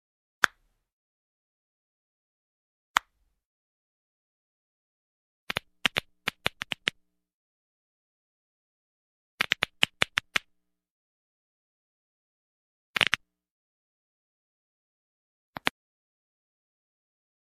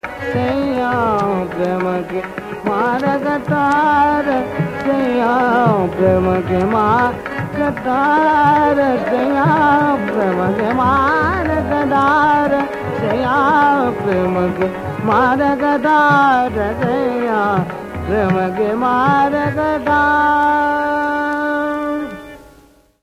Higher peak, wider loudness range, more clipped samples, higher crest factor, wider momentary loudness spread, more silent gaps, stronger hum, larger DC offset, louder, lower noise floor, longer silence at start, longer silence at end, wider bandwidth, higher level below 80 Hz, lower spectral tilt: about the same, -2 dBFS vs 0 dBFS; first, 7 LU vs 2 LU; neither; first, 36 dB vs 16 dB; about the same, 9 LU vs 8 LU; first, 0.92-2.94 s, 3.45-5.47 s, 7.33-9.38 s, 10.90-12.94 s, 13.50-15.53 s vs none; neither; neither; second, -29 LUFS vs -15 LUFS; first, -74 dBFS vs -48 dBFS; first, 0.45 s vs 0.05 s; first, 1.75 s vs 0.65 s; second, 14 kHz vs 16 kHz; second, -66 dBFS vs -38 dBFS; second, -1.5 dB/octave vs -7.5 dB/octave